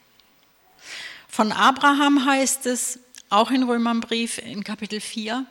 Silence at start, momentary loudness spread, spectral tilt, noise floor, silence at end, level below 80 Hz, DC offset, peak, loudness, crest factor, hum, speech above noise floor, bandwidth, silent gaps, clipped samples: 0.85 s; 16 LU; -2.5 dB/octave; -59 dBFS; 0.05 s; -68 dBFS; under 0.1%; -6 dBFS; -21 LUFS; 18 dB; none; 37 dB; 17 kHz; none; under 0.1%